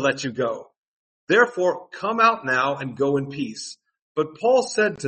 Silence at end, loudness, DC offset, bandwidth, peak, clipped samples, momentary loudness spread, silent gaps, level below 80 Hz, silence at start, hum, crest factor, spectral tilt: 0 s; -22 LUFS; under 0.1%; 8.8 kHz; -4 dBFS; under 0.1%; 12 LU; 0.78-1.27 s, 4.02-4.15 s; -68 dBFS; 0 s; none; 18 dB; -4.5 dB/octave